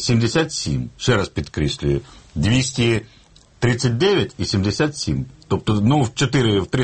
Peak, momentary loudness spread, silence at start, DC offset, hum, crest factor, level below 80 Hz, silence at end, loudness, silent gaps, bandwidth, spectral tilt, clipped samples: -4 dBFS; 7 LU; 0 s; under 0.1%; none; 16 dB; -38 dBFS; 0 s; -20 LUFS; none; 8.8 kHz; -5.5 dB/octave; under 0.1%